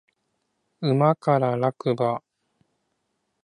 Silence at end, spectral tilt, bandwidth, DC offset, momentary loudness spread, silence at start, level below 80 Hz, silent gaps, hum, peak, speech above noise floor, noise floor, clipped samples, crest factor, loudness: 1.25 s; -8.5 dB/octave; 10 kHz; under 0.1%; 7 LU; 0.8 s; -70 dBFS; none; none; -6 dBFS; 54 dB; -76 dBFS; under 0.1%; 20 dB; -23 LUFS